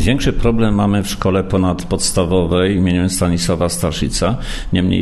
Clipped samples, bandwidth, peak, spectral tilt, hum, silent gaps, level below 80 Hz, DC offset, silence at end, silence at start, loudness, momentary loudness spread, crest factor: under 0.1%; 13 kHz; 0 dBFS; -5.5 dB/octave; none; none; -26 dBFS; under 0.1%; 0 s; 0 s; -16 LUFS; 4 LU; 14 dB